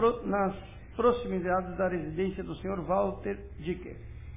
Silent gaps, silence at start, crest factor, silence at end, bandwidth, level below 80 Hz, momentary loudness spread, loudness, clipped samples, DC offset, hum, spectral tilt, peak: none; 0 s; 18 dB; 0 s; 3.8 kHz; -48 dBFS; 12 LU; -31 LUFS; under 0.1%; 0.1%; none; -6.5 dB/octave; -12 dBFS